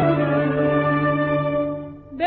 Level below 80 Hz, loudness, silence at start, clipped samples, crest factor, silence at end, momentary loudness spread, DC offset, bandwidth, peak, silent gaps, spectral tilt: -48 dBFS; -20 LUFS; 0 s; under 0.1%; 14 dB; 0 s; 9 LU; under 0.1%; 4.4 kHz; -6 dBFS; none; -6.5 dB/octave